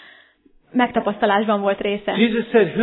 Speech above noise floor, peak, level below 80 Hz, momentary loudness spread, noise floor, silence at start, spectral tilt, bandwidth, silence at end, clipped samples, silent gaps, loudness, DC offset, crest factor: 37 dB; -4 dBFS; -56 dBFS; 5 LU; -55 dBFS; 0.75 s; -9.5 dB/octave; 4.2 kHz; 0 s; under 0.1%; none; -19 LUFS; under 0.1%; 16 dB